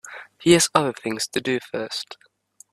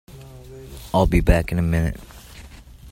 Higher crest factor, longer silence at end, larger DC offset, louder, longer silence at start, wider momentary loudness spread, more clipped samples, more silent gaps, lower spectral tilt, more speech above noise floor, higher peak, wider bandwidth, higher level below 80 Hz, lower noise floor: about the same, 22 dB vs 20 dB; first, 0.6 s vs 0 s; neither; about the same, -22 LUFS vs -21 LUFS; about the same, 0.05 s vs 0.1 s; second, 15 LU vs 24 LU; neither; neither; second, -3.5 dB/octave vs -7 dB/octave; first, 33 dB vs 24 dB; about the same, 0 dBFS vs -2 dBFS; second, 14 kHz vs 16.5 kHz; second, -58 dBFS vs -28 dBFS; first, -55 dBFS vs -42 dBFS